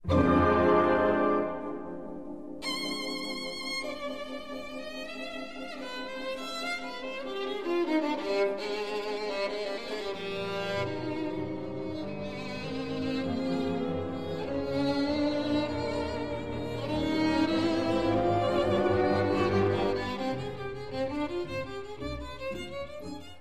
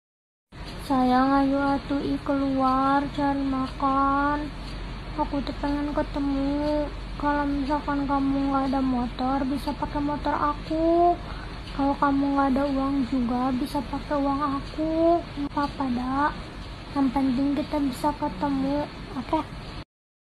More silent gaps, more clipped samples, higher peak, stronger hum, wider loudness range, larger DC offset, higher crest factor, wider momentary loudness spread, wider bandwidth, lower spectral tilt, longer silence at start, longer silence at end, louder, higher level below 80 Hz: neither; neither; second, -12 dBFS vs -8 dBFS; neither; first, 8 LU vs 3 LU; first, 0.4% vs under 0.1%; about the same, 18 dB vs 16 dB; about the same, 12 LU vs 11 LU; about the same, 13.5 kHz vs 12.5 kHz; about the same, -6 dB/octave vs -7 dB/octave; second, 0.05 s vs 0.5 s; second, 0 s vs 0.4 s; second, -31 LUFS vs -25 LUFS; second, -50 dBFS vs -40 dBFS